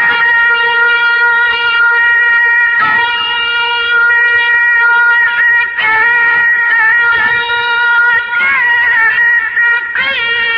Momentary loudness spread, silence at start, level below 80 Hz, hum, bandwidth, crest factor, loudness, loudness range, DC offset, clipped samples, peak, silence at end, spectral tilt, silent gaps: 4 LU; 0 s; -50 dBFS; none; 6.2 kHz; 10 dB; -8 LUFS; 1 LU; under 0.1%; under 0.1%; 0 dBFS; 0 s; 3.5 dB/octave; none